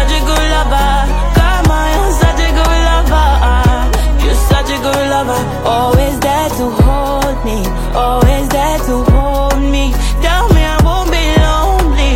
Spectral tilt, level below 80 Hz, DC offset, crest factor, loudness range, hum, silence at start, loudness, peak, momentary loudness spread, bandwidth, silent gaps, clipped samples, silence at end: -5.5 dB/octave; -12 dBFS; under 0.1%; 10 dB; 2 LU; none; 0 s; -12 LUFS; 0 dBFS; 4 LU; 16.5 kHz; none; under 0.1%; 0 s